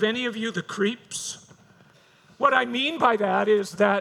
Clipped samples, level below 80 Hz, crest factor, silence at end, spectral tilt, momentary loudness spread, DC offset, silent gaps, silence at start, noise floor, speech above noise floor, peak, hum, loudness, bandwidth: under 0.1%; -72 dBFS; 20 dB; 0 s; -3.5 dB/octave; 11 LU; under 0.1%; none; 0 s; -56 dBFS; 33 dB; -4 dBFS; none; -24 LUFS; 14 kHz